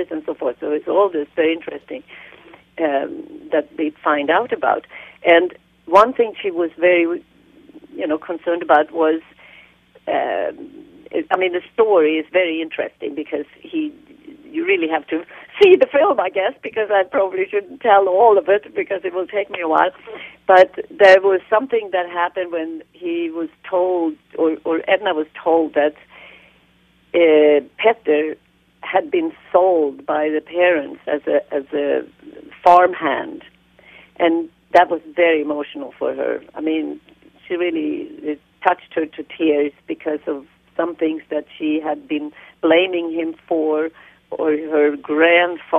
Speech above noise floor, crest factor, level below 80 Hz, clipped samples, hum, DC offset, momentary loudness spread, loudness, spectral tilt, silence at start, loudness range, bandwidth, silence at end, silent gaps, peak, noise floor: 38 dB; 18 dB; -64 dBFS; under 0.1%; none; under 0.1%; 14 LU; -18 LUFS; -5.5 dB/octave; 0 s; 6 LU; 7.6 kHz; 0 s; none; 0 dBFS; -56 dBFS